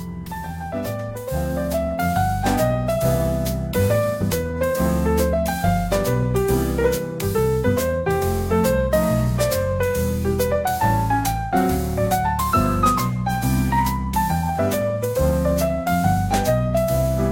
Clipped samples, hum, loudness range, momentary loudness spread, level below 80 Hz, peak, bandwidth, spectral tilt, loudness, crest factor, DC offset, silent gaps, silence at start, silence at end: under 0.1%; none; 1 LU; 4 LU; -30 dBFS; -4 dBFS; 17 kHz; -6 dB/octave; -21 LUFS; 16 dB; under 0.1%; none; 0 s; 0 s